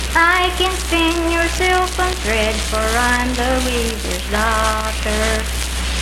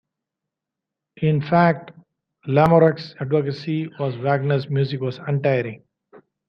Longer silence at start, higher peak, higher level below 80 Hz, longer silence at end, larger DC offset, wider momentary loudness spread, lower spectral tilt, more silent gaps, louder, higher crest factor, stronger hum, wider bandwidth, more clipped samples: second, 0 s vs 1.2 s; about the same, -2 dBFS vs -2 dBFS; first, -24 dBFS vs -58 dBFS; second, 0 s vs 0.7 s; neither; second, 5 LU vs 11 LU; second, -3.5 dB/octave vs -9 dB/octave; neither; first, -17 LUFS vs -21 LUFS; second, 14 dB vs 20 dB; neither; first, 16.5 kHz vs 6 kHz; neither